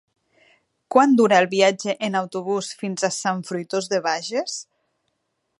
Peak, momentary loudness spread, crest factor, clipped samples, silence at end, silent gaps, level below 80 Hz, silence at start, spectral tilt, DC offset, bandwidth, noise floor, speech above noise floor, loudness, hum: -2 dBFS; 11 LU; 20 dB; under 0.1%; 0.95 s; none; -76 dBFS; 0.9 s; -4 dB/octave; under 0.1%; 11.5 kHz; -74 dBFS; 53 dB; -21 LUFS; none